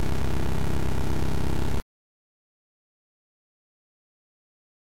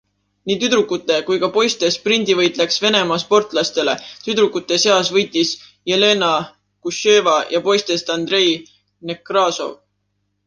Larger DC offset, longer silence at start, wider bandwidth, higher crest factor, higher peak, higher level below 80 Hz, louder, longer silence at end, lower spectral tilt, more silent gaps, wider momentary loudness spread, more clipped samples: first, 8% vs under 0.1%; second, 0 s vs 0.45 s; first, 16 kHz vs 10 kHz; about the same, 18 dB vs 16 dB; second, -18 dBFS vs -2 dBFS; first, -36 dBFS vs -64 dBFS; second, -30 LUFS vs -17 LUFS; first, 3 s vs 0.75 s; first, -6.5 dB/octave vs -3 dB/octave; neither; second, 4 LU vs 12 LU; neither